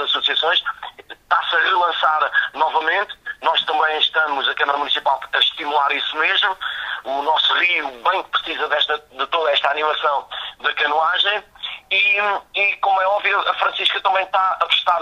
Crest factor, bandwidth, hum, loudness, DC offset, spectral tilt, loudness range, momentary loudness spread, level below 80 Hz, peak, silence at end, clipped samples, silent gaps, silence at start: 16 dB; 15 kHz; none; -18 LUFS; under 0.1%; -1 dB/octave; 1 LU; 7 LU; -62 dBFS; -2 dBFS; 0 s; under 0.1%; none; 0 s